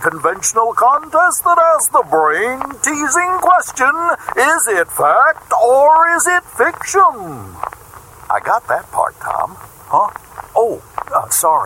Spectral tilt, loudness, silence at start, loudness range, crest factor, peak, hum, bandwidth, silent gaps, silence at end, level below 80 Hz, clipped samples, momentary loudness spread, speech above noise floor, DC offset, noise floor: -2 dB/octave; -13 LUFS; 0 s; 7 LU; 14 dB; -2 dBFS; none; 17 kHz; none; 0 s; -52 dBFS; under 0.1%; 10 LU; 24 dB; under 0.1%; -38 dBFS